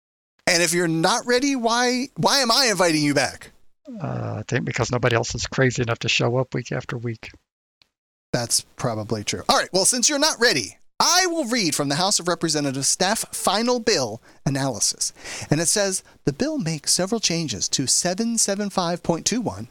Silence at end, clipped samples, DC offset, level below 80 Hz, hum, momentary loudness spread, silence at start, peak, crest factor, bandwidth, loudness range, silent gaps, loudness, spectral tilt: 0.05 s; under 0.1%; under 0.1%; -52 dBFS; none; 11 LU; 0.45 s; -6 dBFS; 18 dB; 19 kHz; 5 LU; 7.52-7.81 s, 7.98-8.33 s; -21 LUFS; -3 dB/octave